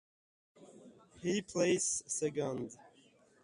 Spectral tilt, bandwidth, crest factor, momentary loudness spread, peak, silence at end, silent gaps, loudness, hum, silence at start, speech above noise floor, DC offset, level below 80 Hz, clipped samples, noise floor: -3.5 dB/octave; 11.5 kHz; 18 dB; 13 LU; -20 dBFS; 0.55 s; none; -35 LUFS; none; 0.6 s; 31 dB; under 0.1%; -74 dBFS; under 0.1%; -66 dBFS